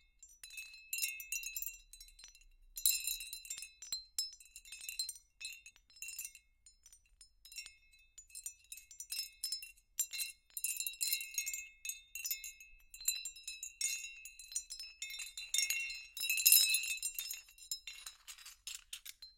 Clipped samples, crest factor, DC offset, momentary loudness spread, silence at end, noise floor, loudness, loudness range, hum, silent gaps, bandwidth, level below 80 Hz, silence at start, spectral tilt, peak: under 0.1%; 34 dB; under 0.1%; 18 LU; 0.05 s; -66 dBFS; -37 LUFS; 15 LU; none; none; 17 kHz; -70 dBFS; 0.2 s; 5.5 dB/octave; -8 dBFS